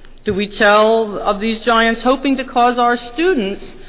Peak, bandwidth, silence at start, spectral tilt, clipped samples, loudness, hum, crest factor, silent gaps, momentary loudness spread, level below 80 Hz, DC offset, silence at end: -2 dBFS; 4 kHz; 0 s; -8.5 dB/octave; under 0.1%; -15 LUFS; none; 12 dB; none; 8 LU; -40 dBFS; under 0.1%; 0 s